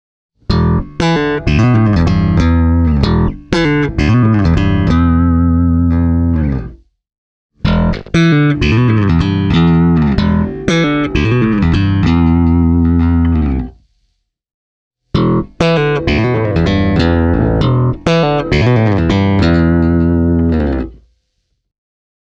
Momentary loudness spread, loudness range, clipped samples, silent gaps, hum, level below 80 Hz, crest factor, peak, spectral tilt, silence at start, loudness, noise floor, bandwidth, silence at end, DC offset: 5 LU; 3 LU; under 0.1%; 7.18-7.50 s, 14.54-14.91 s; none; -22 dBFS; 12 dB; 0 dBFS; -8 dB/octave; 0.5 s; -12 LUFS; -66 dBFS; 8 kHz; 1.4 s; under 0.1%